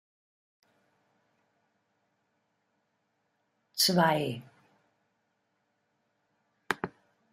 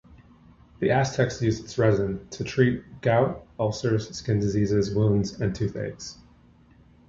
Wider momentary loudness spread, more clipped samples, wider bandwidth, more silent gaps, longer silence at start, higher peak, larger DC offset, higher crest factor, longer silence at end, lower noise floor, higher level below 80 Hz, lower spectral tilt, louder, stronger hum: first, 18 LU vs 8 LU; neither; first, 14 kHz vs 7.8 kHz; neither; first, 3.75 s vs 0.1 s; about the same, -8 dBFS vs -6 dBFS; neither; first, 28 dB vs 20 dB; second, 0.45 s vs 0.95 s; first, -78 dBFS vs -55 dBFS; second, -76 dBFS vs -48 dBFS; second, -3.5 dB/octave vs -6.5 dB/octave; second, -28 LUFS vs -25 LUFS; neither